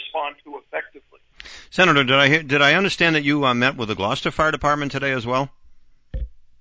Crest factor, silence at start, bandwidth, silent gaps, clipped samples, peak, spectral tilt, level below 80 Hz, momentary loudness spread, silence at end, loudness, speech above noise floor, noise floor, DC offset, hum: 18 dB; 0 s; 8 kHz; none; under 0.1%; -4 dBFS; -4.5 dB/octave; -42 dBFS; 21 LU; 0.2 s; -18 LUFS; 27 dB; -47 dBFS; under 0.1%; none